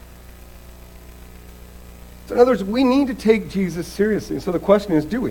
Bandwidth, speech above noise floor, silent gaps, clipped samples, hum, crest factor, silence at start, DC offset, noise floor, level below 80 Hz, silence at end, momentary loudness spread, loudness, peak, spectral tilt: 18 kHz; 23 dB; none; under 0.1%; 60 Hz at -40 dBFS; 20 dB; 0.05 s; under 0.1%; -41 dBFS; -42 dBFS; 0 s; 8 LU; -19 LUFS; 0 dBFS; -6.5 dB/octave